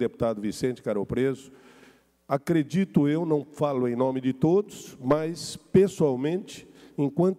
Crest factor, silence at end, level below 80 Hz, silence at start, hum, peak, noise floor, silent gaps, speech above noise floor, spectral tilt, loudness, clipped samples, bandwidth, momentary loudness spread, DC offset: 16 dB; 0.05 s; -56 dBFS; 0 s; none; -10 dBFS; -57 dBFS; none; 32 dB; -7 dB/octave; -26 LUFS; under 0.1%; 15 kHz; 11 LU; under 0.1%